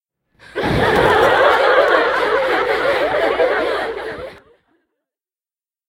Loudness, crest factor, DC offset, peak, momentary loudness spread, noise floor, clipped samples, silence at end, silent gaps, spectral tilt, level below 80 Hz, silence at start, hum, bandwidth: -15 LUFS; 18 dB; under 0.1%; 0 dBFS; 15 LU; under -90 dBFS; under 0.1%; 1.55 s; none; -5 dB/octave; -42 dBFS; 0.55 s; none; 16 kHz